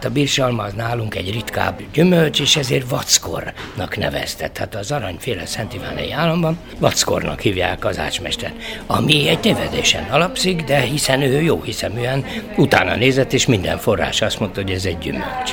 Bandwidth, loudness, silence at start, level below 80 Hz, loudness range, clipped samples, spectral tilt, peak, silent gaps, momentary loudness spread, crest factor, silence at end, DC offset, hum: 19 kHz; -18 LUFS; 0 s; -38 dBFS; 5 LU; under 0.1%; -4 dB/octave; 0 dBFS; none; 10 LU; 18 dB; 0 s; under 0.1%; none